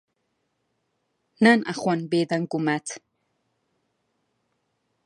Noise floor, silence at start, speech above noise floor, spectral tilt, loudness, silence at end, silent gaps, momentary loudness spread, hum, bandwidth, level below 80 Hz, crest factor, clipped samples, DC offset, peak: -75 dBFS; 1.4 s; 53 dB; -5.5 dB/octave; -23 LUFS; 2.05 s; none; 12 LU; none; 11.5 kHz; -78 dBFS; 22 dB; under 0.1%; under 0.1%; -4 dBFS